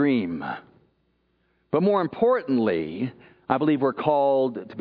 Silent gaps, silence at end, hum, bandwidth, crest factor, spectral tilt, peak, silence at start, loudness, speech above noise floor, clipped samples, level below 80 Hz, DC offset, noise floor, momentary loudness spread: none; 0 s; none; 5.2 kHz; 20 dB; -10.5 dB/octave; -4 dBFS; 0 s; -24 LUFS; 46 dB; under 0.1%; -64 dBFS; under 0.1%; -69 dBFS; 11 LU